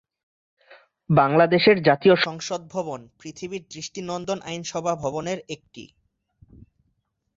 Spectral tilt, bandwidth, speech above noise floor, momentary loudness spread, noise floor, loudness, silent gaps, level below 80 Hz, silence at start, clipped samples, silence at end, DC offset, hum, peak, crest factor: -5 dB/octave; 7.8 kHz; 50 dB; 18 LU; -73 dBFS; -22 LUFS; none; -60 dBFS; 0.7 s; under 0.1%; 1.5 s; under 0.1%; none; -4 dBFS; 20 dB